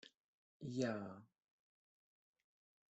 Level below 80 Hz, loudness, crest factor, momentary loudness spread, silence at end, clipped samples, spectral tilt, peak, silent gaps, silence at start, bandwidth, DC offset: -86 dBFS; -45 LUFS; 22 dB; 19 LU; 1.65 s; under 0.1%; -6 dB/octave; -28 dBFS; 0.17-0.60 s; 0.05 s; 8.2 kHz; under 0.1%